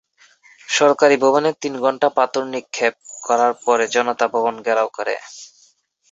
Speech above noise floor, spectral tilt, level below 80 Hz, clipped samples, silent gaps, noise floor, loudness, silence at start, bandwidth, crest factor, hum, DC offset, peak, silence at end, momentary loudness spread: 39 dB; -3 dB/octave; -70 dBFS; under 0.1%; none; -57 dBFS; -18 LUFS; 0.7 s; 8 kHz; 18 dB; none; under 0.1%; -2 dBFS; 0.65 s; 12 LU